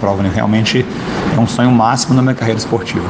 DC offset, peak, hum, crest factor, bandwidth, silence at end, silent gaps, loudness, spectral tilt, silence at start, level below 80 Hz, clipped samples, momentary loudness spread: under 0.1%; 0 dBFS; none; 12 dB; 9.8 kHz; 0 s; none; -14 LUFS; -5.5 dB/octave; 0 s; -38 dBFS; under 0.1%; 6 LU